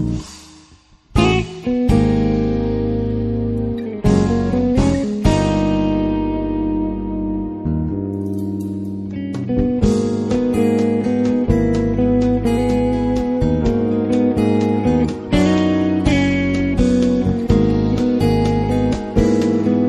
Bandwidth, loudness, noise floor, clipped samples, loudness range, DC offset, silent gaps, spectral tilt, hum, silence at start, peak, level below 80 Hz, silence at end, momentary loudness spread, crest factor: 12 kHz; -18 LUFS; -48 dBFS; under 0.1%; 4 LU; under 0.1%; none; -7.5 dB/octave; none; 0 s; 0 dBFS; -28 dBFS; 0 s; 7 LU; 16 dB